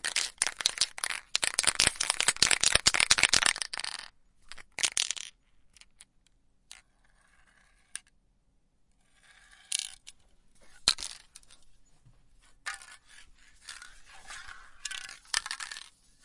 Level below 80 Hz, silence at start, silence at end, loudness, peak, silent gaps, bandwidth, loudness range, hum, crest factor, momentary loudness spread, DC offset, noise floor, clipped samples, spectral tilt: -58 dBFS; 0.05 s; 0.45 s; -27 LUFS; 0 dBFS; none; 11.5 kHz; 20 LU; none; 34 dB; 24 LU; under 0.1%; -69 dBFS; under 0.1%; 1 dB/octave